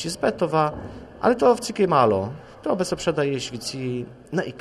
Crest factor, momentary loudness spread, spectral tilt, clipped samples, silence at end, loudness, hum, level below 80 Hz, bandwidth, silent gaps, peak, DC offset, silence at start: 18 dB; 13 LU; -5.5 dB/octave; under 0.1%; 0 s; -23 LUFS; none; -52 dBFS; 13 kHz; none; -4 dBFS; under 0.1%; 0 s